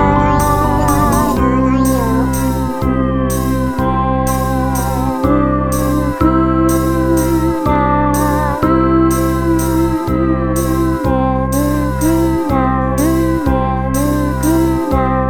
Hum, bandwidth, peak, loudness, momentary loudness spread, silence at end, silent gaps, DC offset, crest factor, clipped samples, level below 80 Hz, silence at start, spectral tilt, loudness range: none; 19.5 kHz; 0 dBFS; -14 LUFS; 3 LU; 0 s; none; 0.5%; 12 dB; under 0.1%; -22 dBFS; 0 s; -6.5 dB/octave; 2 LU